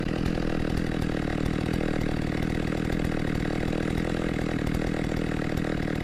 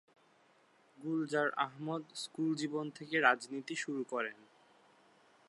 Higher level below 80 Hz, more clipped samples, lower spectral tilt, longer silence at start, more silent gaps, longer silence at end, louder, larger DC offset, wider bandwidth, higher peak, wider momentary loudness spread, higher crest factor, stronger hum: first, -36 dBFS vs under -90 dBFS; neither; first, -7 dB/octave vs -4.5 dB/octave; second, 0 s vs 1 s; neither; second, 0 s vs 1.15 s; first, -28 LUFS vs -36 LUFS; first, 0.3% vs under 0.1%; first, 15 kHz vs 11.5 kHz; about the same, -12 dBFS vs -12 dBFS; second, 1 LU vs 11 LU; second, 14 dB vs 26 dB; neither